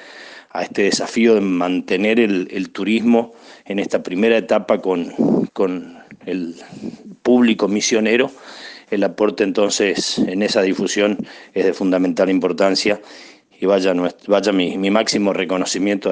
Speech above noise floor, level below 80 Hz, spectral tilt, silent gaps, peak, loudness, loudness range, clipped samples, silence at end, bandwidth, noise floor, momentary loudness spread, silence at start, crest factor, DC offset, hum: 22 dB; -64 dBFS; -4.5 dB/octave; none; -2 dBFS; -18 LUFS; 2 LU; under 0.1%; 0 s; 10 kHz; -39 dBFS; 12 LU; 0 s; 16 dB; under 0.1%; none